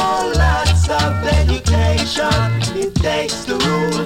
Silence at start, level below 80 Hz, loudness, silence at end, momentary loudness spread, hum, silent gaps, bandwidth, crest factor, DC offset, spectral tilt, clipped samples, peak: 0 s; -22 dBFS; -16 LUFS; 0 s; 4 LU; none; none; 16 kHz; 12 dB; under 0.1%; -5 dB/octave; under 0.1%; -4 dBFS